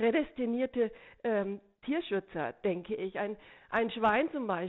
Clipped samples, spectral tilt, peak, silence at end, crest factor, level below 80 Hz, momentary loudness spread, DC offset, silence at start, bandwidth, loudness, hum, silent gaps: under 0.1%; -4 dB/octave; -18 dBFS; 0 s; 16 dB; -64 dBFS; 10 LU; under 0.1%; 0 s; 4.1 kHz; -33 LUFS; none; none